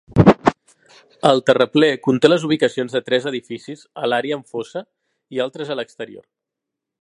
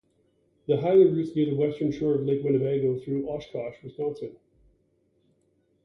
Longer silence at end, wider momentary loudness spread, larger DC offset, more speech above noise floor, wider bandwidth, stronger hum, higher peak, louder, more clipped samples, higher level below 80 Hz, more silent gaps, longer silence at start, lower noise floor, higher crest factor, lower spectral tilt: second, 0.8 s vs 1.55 s; about the same, 18 LU vs 16 LU; neither; first, 64 dB vs 44 dB; first, 11 kHz vs 6.4 kHz; neither; first, 0 dBFS vs -10 dBFS; first, -18 LUFS vs -26 LUFS; neither; first, -44 dBFS vs -62 dBFS; neither; second, 0.1 s vs 0.7 s; first, -83 dBFS vs -69 dBFS; about the same, 20 dB vs 18 dB; second, -6.5 dB/octave vs -9.5 dB/octave